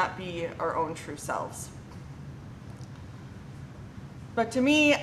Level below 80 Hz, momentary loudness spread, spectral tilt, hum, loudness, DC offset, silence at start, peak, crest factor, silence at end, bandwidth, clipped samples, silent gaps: -54 dBFS; 20 LU; -4.5 dB/octave; none; -29 LUFS; under 0.1%; 0 s; -12 dBFS; 20 dB; 0 s; 13.5 kHz; under 0.1%; none